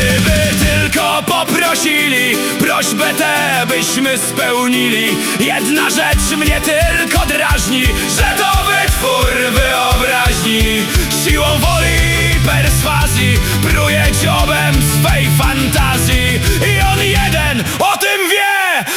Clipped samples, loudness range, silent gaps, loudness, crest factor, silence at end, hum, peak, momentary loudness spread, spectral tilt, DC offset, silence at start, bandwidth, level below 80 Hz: under 0.1%; 1 LU; none; -12 LUFS; 12 dB; 0 s; none; 0 dBFS; 2 LU; -3.5 dB/octave; under 0.1%; 0 s; 19 kHz; -20 dBFS